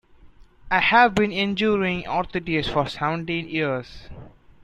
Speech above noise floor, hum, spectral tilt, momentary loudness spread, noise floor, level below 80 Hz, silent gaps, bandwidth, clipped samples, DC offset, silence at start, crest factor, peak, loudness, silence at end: 27 dB; none; -6 dB/octave; 10 LU; -49 dBFS; -48 dBFS; none; 10.5 kHz; under 0.1%; under 0.1%; 0.25 s; 20 dB; -2 dBFS; -22 LUFS; 0.35 s